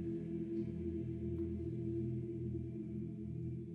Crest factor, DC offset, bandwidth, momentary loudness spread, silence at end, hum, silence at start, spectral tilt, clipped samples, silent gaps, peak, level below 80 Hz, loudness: 12 dB; under 0.1%; 3.9 kHz; 4 LU; 0 s; none; 0 s; -11.5 dB/octave; under 0.1%; none; -30 dBFS; -58 dBFS; -42 LUFS